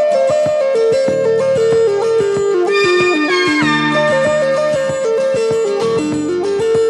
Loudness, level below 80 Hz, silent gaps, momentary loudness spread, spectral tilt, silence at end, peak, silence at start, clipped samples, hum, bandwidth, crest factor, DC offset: -14 LUFS; -52 dBFS; none; 4 LU; -4.5 dB/octave; 0 s; -2 dBFS; 0 s; under 0.1%; none; 11 kHz; 10 dB; under 0.1%